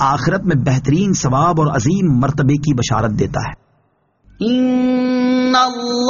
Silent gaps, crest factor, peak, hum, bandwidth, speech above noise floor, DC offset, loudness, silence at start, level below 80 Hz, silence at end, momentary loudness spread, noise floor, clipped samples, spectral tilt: none; 14 dB; 0 dBFS; none; 7.4 kHz; 45 dB; under 0.1%; -15 LUFS; 0 s; -40 dBFS; 0 s; 5 LU; -60 dBFS; under 0.1%; -6 dB/octave